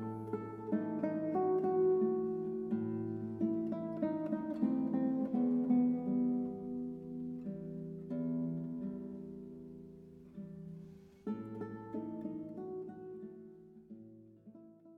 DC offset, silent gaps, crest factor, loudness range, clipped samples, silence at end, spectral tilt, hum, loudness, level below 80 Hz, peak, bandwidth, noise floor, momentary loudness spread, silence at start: under 0.1%; none; 16 dB; 12 LU; under 0.1%; 0 s; -11 dB/octave; none; -37 LUFS; -72 dBFS; -22 dBFS; 3.6 kHz; -57 dBFS; 22 LU; 0 s